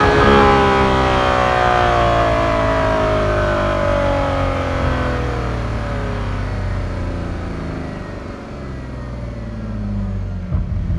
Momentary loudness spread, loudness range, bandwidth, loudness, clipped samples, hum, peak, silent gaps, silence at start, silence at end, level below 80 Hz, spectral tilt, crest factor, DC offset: 15 LU; 12 LU; 12 kHz; -17 LUFS; under 0.1%; none; 0 dBFS; none; 0 s; 0 s; -26 dBFS; -6.5 dB/octave; 16 dB; under 0.1%